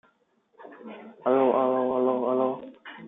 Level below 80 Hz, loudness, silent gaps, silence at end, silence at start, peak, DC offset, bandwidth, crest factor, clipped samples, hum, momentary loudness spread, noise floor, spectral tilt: -76 dBFS; -25 LUFS; none; 0 s; 0.6 s; -10 dBFS; under 0.1%; 3.8 kHz; 18 dB; under 0.1%; none; 21 LU; -67 dBFS; -9.5 dB/octave